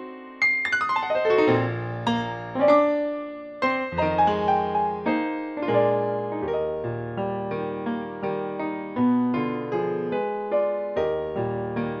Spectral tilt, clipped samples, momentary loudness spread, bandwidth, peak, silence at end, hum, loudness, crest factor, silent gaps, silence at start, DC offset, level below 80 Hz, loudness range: -7 dB/octave; under 0.1%; 9 LU; 8.4 kHz; -6 dBFS; 0 s; none; -25 LUFS; 18 dB; none; 0 s; under 0.1%; -56 dBFS; 4 LU